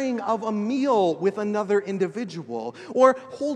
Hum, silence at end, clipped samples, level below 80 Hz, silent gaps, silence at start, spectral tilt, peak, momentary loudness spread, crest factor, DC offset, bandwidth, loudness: none; 0 s; under 0.1%; -76 dBFS; none; 0 s; -6 dB/octave; -4 dBFS; 13 LU; 20 dB; under 0.1%; 9.8 kHz; -24 LUFS